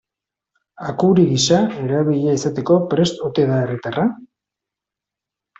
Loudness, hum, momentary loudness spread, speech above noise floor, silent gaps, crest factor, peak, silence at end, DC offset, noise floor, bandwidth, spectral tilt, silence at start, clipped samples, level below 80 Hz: -18 LUFS; none; 8 LU; 69 dB; none; 16 dB; -4 dBFS; 1.35 s; under 0.1%; -86 dBFS; 8 kHz; -6 dB/octave; 0.8 s; under 0.1%; -56 dBFS